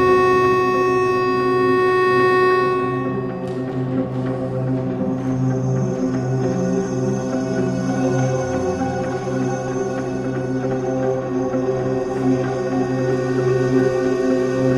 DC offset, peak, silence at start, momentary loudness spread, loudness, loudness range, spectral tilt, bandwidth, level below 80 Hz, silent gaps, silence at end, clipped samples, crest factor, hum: under 0.1%; -4 dBFS; 0 s; 8 LU; -20 LUFS; 5 LU; -7 dB/octave; 11 kHz; -48 dBFS; none; 0 s; under 0.1%; 14 dB; none